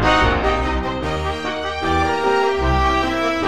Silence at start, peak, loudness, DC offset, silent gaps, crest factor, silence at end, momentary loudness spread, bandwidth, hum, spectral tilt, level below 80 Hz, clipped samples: 0 s; -2 dBFS; -19 LUFS; 1%; none; 16 dB; 0 s; 6 LU; 13.5 kHz; none; -5.5 dB/octave; -26 dBFS; under 0.1%